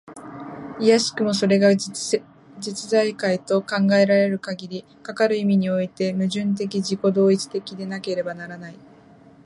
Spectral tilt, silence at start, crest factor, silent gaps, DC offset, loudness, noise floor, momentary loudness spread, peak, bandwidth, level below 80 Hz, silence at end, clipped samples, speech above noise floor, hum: -5.5 dB/octave; 0.05 s; 18 dB; none; under 0.1%; -21 LUFS; -49 dBFS; 18 LU; -4 dBFS; 11.5 kHz; -66 dBFS; 0.7 s; under 0.1%; 28 dB; none